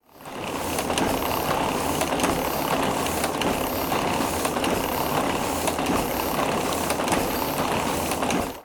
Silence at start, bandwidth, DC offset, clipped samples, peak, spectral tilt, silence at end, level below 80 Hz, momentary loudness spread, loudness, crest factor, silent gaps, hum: 0.15 s; over 20 kHz; under 0.1%; under 0.1%; -6 dBFS; -3.5 dB/octave; 0 s; -44 dBFS; 2 LU; -24 LUFS; 20 dB; none; none